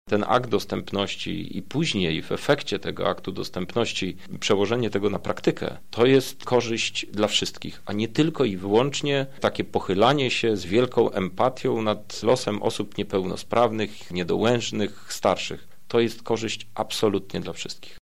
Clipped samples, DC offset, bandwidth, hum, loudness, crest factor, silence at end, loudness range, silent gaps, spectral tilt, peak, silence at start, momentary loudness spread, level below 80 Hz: under 0.1%; 1%; 16 kHz; none; -25 LUFS; 18 dB; 0 s; 3 LU; none; -5 dB/octave; -6 dBFS; 0.05 s; 9 LU; -56 dBFS